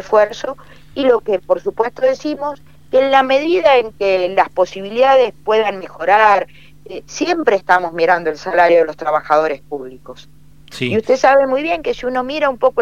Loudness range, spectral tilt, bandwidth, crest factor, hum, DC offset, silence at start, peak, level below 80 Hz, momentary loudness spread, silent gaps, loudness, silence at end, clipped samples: 3 LU; -4.5 dB/octave; 9.2 kHz; 16 dB; none; 0.8%; 0 s; 0 dBFS; -50 dBFS; 15 LU; none; -15 LUFS; 0 s; under 0.1%